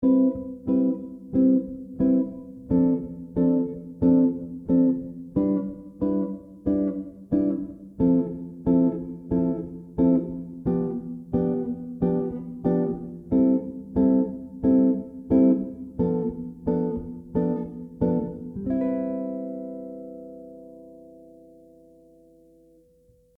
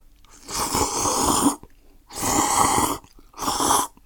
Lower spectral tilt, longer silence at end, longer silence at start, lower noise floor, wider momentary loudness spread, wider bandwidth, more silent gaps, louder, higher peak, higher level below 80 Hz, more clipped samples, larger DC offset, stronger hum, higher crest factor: first, -12.5 dB/octave vs -2.5 dB/octave; first, 2.15 s vs 0.2 s; second, 0 s vs 0.45 s; first, -59 dBFS vs -49 dBFS; about the same, 13 LU vs 12 LU; second, 2.4 kHz vs 17.5 kHz; neither; second, -25 LUFS vs -21 LUFS; second, -8 dBFS vs -2 dBFS; second, -50 dBFS vs -42 dBFS; neither; neither; neither; second, 16 dB vs 22 dB